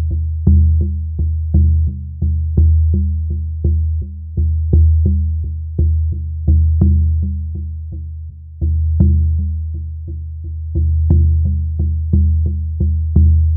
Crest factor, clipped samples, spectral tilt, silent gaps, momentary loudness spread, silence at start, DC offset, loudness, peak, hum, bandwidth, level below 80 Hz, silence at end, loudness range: 14 dB; under 0.1%; -16.5 dB/octave; none; 13 LU; 0 s; under 0.1%; -16 LUFS; 0 dBFS; none; 0.8 kHz; -18 dBFS; 0 s; 3 LU